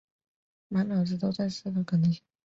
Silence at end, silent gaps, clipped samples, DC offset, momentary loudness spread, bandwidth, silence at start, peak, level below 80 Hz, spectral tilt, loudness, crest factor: 0.25 s; none; under 0.1%; under 0.1%; 6 LU; 7.6 kHz; 0.7 s; -18 dBFS; -66 dBFS; -7.5 dB/octave; -29 LUFS; 12 dB